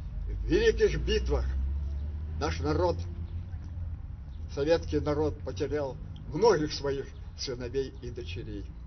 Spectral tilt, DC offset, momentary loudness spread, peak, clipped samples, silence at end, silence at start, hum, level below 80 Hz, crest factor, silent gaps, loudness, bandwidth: -6 dB/octave; under 0.1%; 14 LU; -10 dBFS; under 0.1%; 0 s; 0 s; none; -36 dBFS; 20 dB; none; -31 LUFS; 6.4 kHz